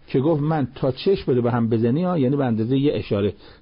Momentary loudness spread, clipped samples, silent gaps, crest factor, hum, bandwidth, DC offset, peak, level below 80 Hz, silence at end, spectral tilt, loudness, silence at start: 3 LU; under 0.1%; none; 10 dB; none; 5.4 kHz; under 0.1%; -10 dBFS; -48 dBFS; 0.1 s; -12.5 dB/octave; -21 LUFS; 0.1 s